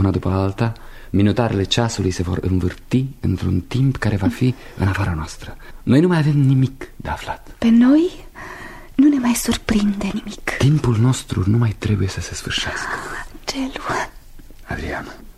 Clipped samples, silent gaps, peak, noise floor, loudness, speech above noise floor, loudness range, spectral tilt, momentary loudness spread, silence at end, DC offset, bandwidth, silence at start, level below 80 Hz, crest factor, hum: under 0.1%; none; 0 dBFS; -38 dBFS; -19 LUFS; 20 dB; 4 LU; -6 dB/octave; 14 LU; 0.05 s; under 0.1%; 14.5 kHz; 0 s; -36 dBFS; 18 dB; none